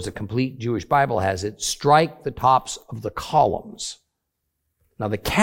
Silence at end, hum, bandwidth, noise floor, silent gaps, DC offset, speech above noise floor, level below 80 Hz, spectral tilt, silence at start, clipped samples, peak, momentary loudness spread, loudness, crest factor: 0 s; none; 17 kHz; -78 dBFS; none; under 0.1%; 56 dB; -48 dBFS; -4.5 dB/octave; 0 s; under 0.1%; -2 dBFS; 14 LU; -22 LUFS; 20 dB